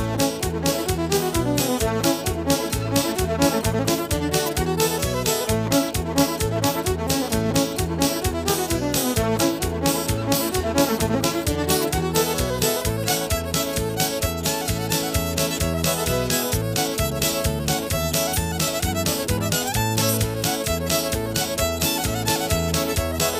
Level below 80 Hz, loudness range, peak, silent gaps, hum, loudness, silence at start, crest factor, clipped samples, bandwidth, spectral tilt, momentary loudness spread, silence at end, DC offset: -36 dBFS; 1 LU; -4 dBFS; none; none; -22 LUFS; 0 s; 18 dB; under 0.1%; 16 kHz; -4 dB/octave; 2 LU; 0 s; under 0.1%